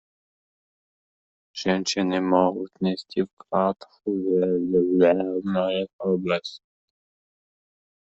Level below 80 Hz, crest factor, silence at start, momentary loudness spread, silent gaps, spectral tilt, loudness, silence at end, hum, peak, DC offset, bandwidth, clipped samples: -66 dBFS; 20 dB; 1.55 s; 9 LU; 3.33-3.37 s, 5.93-5.99 s; -5.5 dB/octave; -24 LUFS; 1.45 s; none; -4 dBFS; under 0.1%; 8 kHz; under 0.1%